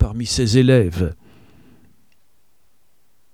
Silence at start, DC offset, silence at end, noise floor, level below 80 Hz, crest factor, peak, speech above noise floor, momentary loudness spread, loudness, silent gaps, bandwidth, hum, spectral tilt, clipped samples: 0 s; 0.3%; 2.2 s; -65 dBFS; -34 dBFS; 18 dB; -2 dBFS; 49 dB; 12 LU; -17 LUFS; none; 13.5 kHz; none; -6 dB/octave; under 0.1%